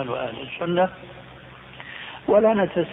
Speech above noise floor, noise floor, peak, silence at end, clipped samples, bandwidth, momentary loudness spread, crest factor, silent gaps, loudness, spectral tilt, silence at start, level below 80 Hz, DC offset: 20 dB; -43 dBFS; -6 dBFS; 0 s; under 0.1%; 4 kHz; 24 LU; 18 dB; none; -22 LUFS; -9.5 dB/octave; 0 s; -56 dBFS; under 0.1%